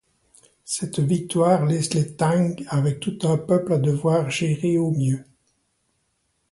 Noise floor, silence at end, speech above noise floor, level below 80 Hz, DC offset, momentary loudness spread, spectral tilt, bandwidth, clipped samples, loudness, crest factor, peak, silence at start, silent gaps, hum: -71 dBFS; 1.3 s; 50 dB; -60 dBFS; under 0.1%; 5 LU; -6.5 dB/octave; 11.5 kHz; under 0.1%; -22 LUFS; 18 dB; -6 dBFS; 0.65 s; none; none